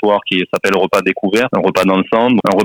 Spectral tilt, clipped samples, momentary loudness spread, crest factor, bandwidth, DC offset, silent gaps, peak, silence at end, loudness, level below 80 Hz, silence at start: -5.5 dB/octave; under 0.1%; 3 LU; 12 dB; over 20 kHz; under 0.1%; none; -2 dBFS; 0 s; -14 LUFS; -52 dBFS; 0 s